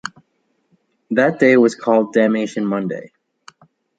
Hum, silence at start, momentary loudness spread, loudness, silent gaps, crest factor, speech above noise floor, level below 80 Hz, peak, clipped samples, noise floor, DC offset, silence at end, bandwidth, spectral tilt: none; 0.05 s; 13 LU; -16 LUFS; none; 18 dB; 51 dB; -66 dBFS; -2 dBFS; under 0.1%; -67 dBFS; under 0.1%; 0.95 s; 9.2 kHz; -6 dB/octave